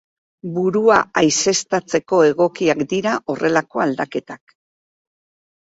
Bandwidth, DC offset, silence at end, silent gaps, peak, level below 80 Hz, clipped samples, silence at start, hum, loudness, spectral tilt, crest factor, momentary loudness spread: 8 kHz; under 0.1%; 1.4 s; none; -2 dBFS; -60 dBFS; under 0.1%; 0.45 s; none; -18 LUFS; -4 dB/octave; 18 dB; 12 LU